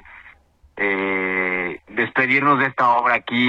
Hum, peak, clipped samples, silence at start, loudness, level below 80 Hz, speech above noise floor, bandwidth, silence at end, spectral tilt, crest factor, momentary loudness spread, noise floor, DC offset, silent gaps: none; -4 dBFS; under 0.1%; 0.05 s; -19 LUFS; -58 dBFS; 33 dB; 7.6 kHz; 0 s; -6.5 dB/octave; 16 dB; 8 LU; -51 dBFS; under 0.1%; none